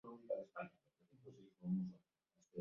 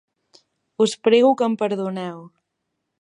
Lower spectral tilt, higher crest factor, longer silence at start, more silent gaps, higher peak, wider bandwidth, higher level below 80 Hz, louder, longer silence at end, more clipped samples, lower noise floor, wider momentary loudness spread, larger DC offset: first, -9.5 dB/octave vs -5 dB/octave; about the same, 18 dB vs 18 dB; second, 0.05 s vs 0.8 s; neither; second, -32 dBFS vs -4 dBFS; second, 7 kHz vs 11 kHz; second, -88 dBFS vs -78 dBFS; second, -48 LUFS vs -20 LUFS; second, 0 s vs 0.75 s; neither; first, -82 dBFS vs -77 dBFS; about the same, 20 LU vs 19 LU; neither